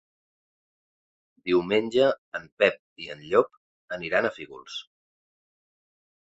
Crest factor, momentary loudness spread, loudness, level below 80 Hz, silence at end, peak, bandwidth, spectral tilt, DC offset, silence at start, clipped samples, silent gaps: 24 dB; 15 LU; -25 LUFS; -66 dBFS; 1.55 s; -4 dBFS; 8 kHz; -5.5 dB/octave; under 0.1%; 1.45 s; under 0.1%; 2.18-2.32 s, 2.52-2.57 s, 2.79-2.96 s, 3.57-3.88 s